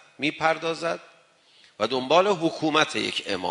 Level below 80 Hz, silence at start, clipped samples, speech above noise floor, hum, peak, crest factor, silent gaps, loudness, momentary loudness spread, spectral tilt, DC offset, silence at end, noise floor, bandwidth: -70 dBFS; 0.2 s; under 0.1%; 33 dB; none; -2 dBFS; 22 dB; none; -24 LUFS; 9 LU; -4 dB/octave; under 0.1%; 0 s; -58 dBFS; 11 kHz